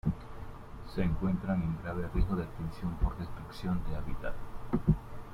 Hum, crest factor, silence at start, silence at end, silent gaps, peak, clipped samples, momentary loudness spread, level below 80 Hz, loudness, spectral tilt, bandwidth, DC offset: none; 20 dB; 0.05 s; 0 s; none; -14 dBFS; under 0.1%; 13 LU; -40 dBFS; -35 LUFS; -9 dB/octave; 14.5 kHz; under 0.1%